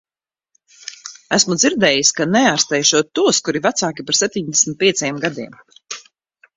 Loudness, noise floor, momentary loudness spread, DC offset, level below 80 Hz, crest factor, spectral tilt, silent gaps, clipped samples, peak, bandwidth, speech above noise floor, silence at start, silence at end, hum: -15 LUFS; -84 dBFS; 18 LU; under 0.1%; -60 dBFS; 18 dB; -2 dB/octave; none; under 0.1%; 0 dBFS; 8 kHz; 67 dB; 0.85 s; 0.55 s; none